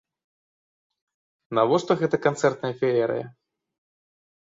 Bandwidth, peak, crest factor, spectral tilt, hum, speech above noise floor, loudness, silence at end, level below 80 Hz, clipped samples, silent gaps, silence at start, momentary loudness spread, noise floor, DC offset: 7.8 kHz; -6 dBFS; 20 dB; -6 dB/octave; none; over 67 dB; -24 LUFS; 1.25 s; -66 dBFS; under 0.1%; none; 1.5 s; 7 LU; under -90 dBFS; under 0.1%